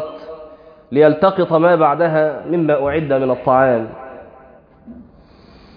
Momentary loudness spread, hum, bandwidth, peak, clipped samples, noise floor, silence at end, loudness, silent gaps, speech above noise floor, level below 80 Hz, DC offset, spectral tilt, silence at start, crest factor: 21 LU; none; 5.2 kHz; 0 dBFS; under 0.1%; -45 dBFS; 0.75 s; -15 LUFS; none; 31 dB; -52 dBFS; under 0.1%; -10.5 dB/octave; 0 s; 16 dB